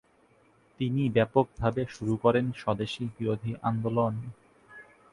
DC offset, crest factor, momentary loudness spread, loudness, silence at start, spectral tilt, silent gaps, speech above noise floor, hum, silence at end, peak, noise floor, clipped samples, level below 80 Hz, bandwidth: under 0.1%; 22 dB; 8 LU; -29 LUFS; 0.8 s; -8 dB/octave; none; 35 dB; none; 0.3 s; -8 dBFS; -63 dBFS; under 0.1%; -56 dBFS; 11 kHz